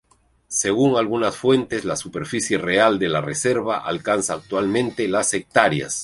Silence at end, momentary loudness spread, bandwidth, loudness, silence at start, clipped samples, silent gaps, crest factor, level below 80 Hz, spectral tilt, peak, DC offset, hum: 0 s; 7 LU; 11.5 kHz; -20 LUFS; 0.5 s; under 0.1%; none; 20 dB; -56 dBFS; -4 dB/octave; -2 dBFS; under 0.1%; none